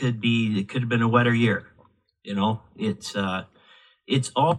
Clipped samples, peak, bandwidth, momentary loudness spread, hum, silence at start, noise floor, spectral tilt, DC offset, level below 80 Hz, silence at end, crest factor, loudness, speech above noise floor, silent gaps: under 0.1%; -4 dBFS; 11.5 kHz; 10 LU; none; 0 s; -60 dBFS; -6 dB/octave; under 0.1%; -66 dBFS; 0 s; 20 dB; -24 LUFS; 37 dB; none